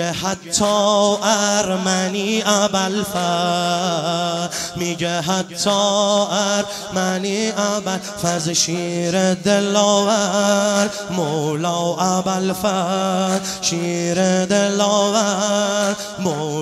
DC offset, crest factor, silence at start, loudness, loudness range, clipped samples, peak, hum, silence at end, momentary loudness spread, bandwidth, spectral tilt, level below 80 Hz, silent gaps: under 0.1%; 18 dB; 0 s; -18 LUFS; 2 LU; under 0.1%; -2 dBFS; none; 0 s; 6 LU; 15 kHz; -3.5 dB/octave; -56 dBFS; none